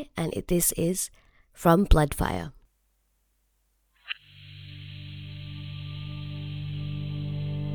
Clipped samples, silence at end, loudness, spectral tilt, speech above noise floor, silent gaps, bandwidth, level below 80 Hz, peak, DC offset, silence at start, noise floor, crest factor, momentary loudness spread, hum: under 0.1%; 0 s; -28 LUFS; -5 dB/octave; 47 dB; none; over 20 kHz; -36 dBFS; -6 dBFS; under 0.1%; 0 s; -71 dBFS; 24 dB; 19 LU; none